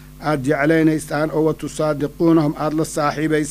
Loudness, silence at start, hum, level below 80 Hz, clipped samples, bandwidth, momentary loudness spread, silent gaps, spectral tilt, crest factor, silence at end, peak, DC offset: -19 LUFS; 0 s; none; -44 dBFS; under 0.1%; 15.5 kHz; 6 LU; none; -6.5 dB/octave; 16 dB; 0 s; -4 dBFS; under 0.1%